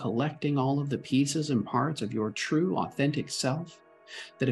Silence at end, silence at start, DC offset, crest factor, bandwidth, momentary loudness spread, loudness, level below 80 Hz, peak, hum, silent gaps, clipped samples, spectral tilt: 0 s; 0 s; under 0.1%; 16 dB; 12.5 kHz; 9 LU; -29 LUFS; -70 dBFS; -12 dBFS; none; none; under 0.1%; -5.5 dB/octave